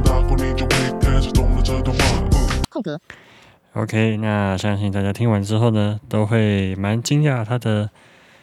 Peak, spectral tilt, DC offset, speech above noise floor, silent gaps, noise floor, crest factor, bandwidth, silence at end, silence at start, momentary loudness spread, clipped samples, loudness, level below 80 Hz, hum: -4 dBFS; -6 dB/octave; under 0.1%; 30 dB; none; -49 dBFS; 16 dB; 15 kHz; 0.55 s; 0 s; 6 LU; under 0.1%; -20 LUFS; -24 dBFS; none